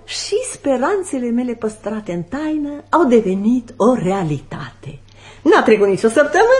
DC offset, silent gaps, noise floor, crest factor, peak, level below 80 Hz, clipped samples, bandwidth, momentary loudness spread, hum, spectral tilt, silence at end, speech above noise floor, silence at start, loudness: under 0.1%; none; -40 dBFS; 16 dB; 0 dBFS; -48 dBFS; under 0.1%; 11.5 kHz; 12 LU; none; -5.5 dB/octave; 0 s; 24 dB; 0.1 s; -17 LUFS